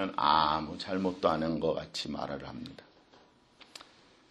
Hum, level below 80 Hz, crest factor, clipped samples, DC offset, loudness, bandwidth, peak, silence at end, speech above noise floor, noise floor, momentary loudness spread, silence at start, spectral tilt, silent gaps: none; -60 dBFS; 22 dB; under 0.1%; under 0.1%; -31 LUFS; 11.5 kHz; -10 dBFS; 0.5 s; 30 dB; -62 dBFS; 24 LU; 0 s; -5.5 dB/octave; none